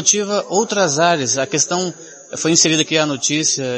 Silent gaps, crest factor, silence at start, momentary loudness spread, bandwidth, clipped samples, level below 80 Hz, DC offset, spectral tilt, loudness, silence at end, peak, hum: none; 18 dB; 0 s; 9 LU; 8.8 kHz; under 0.1%; -64 dBFS; under 0.1%; -2.5 dB/octave; -16 LUFS; 0 s; 0 dBFS; none